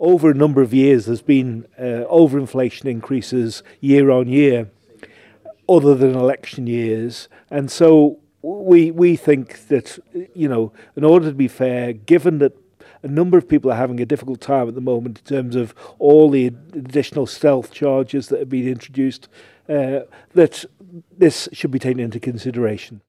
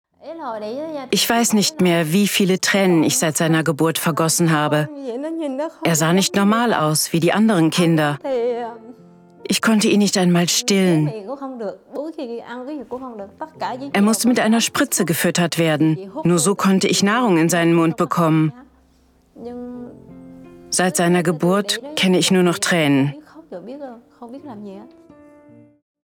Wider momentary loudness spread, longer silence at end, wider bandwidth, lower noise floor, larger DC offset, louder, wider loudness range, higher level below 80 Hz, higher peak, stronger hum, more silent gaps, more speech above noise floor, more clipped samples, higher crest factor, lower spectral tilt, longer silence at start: second, 13 LU vs 17 LU; second, 0.1 s vs 1.15 s; second, 12.5 kHz vs 19.5 kHz; second, -45 dBFS vs -56 dBFS; neither; about the same, -17 LUFS vs -17 LUFS; about the same, 4 LU vs 5 LU; about the same, -60 dBFS vs -64 dBFS; about the same, -2 dBFS vs -4 dBFS; neither; neither; second, 29 dB vs 38 dB; neither; about the same, 16 dB vs 14 dB; first, -7.5 dB/octave vs -4.5 dB/octave; second, 0 s vs 0.25 s